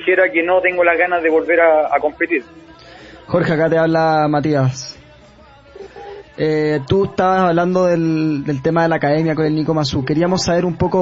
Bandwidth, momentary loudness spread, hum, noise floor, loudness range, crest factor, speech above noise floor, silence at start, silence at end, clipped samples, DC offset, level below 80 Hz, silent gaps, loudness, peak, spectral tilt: 8 kHz; 7 LU; none; -44 dBFS; 3 LU; 16 dB; 29 dB; 0 s; 0 s; under 0.1%; under 0.1%; -46 dBFS; none; -16 LUFS; 0 dBFS; -6.5 dB/octave